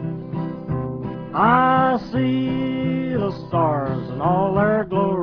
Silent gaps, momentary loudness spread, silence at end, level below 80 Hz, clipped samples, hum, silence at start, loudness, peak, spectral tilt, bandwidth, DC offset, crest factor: none; 12 LU; 0 s; -48 dBFS; under 0.1%; none; 0 s; -21 LUFS; -2 dBFS; -9.5 dB/octave; 5.4 kHz; under 0.1%; 18 dB